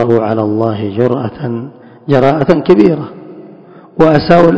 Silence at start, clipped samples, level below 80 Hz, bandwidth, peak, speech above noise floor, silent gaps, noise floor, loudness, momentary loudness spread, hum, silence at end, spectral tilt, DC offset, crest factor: 0 s; 2%; -42 dBFS; 8 kHz; 0 dBFS; 26 dB; none; -36 dBFS; -11 LUFS; 20 LU; none; 0 s; -9 dB/octave; under 0.1%; 12 dB